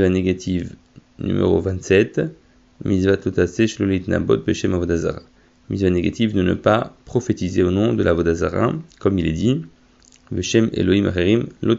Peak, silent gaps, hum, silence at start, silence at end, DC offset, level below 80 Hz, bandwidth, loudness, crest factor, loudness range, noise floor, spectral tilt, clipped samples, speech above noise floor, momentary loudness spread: -2 dBFS; none; none; 0 s; 0 s; under 0.1%; -42 dBFS; 8 kHz; -20 LUFS; 18 dB; 1 LU; -52 dBFS; -6.5 dB/octave; under 0.1%; 33 dB; 8 LU